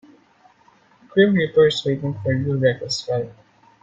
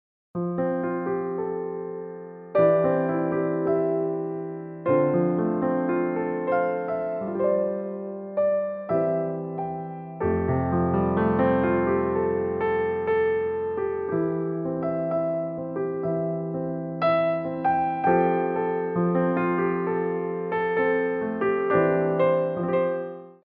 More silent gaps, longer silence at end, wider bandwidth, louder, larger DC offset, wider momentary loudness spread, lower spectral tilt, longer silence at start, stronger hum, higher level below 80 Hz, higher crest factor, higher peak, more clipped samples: neither; first, 0.5 s vs 0.1 s; first, 9.2 kHz vs 5 kHz; first, -20 LUFS vs -25 LUFS; neither; about the same, 9 LU vs 9 LU; second, -6 dB/octave vs -7.5 dB/octave; first, 1.15 s vs 0.35 s; neither; about the same, -58 dBFS vs -54 dBFS; about the same, 18 dB vs 18 dB; first, -4 dBFS vs -8 dBFS; neither